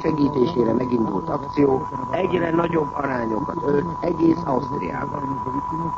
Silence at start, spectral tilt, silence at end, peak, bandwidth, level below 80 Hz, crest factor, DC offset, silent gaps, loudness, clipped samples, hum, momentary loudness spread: 0 s; -8.5 dB/octave; 0 s; -6 dBFS; 7.4 kHz; -46 dBFS; 16 dB; under 0.1%; none; -22 LUFS; under 0.1%; none; 6 LU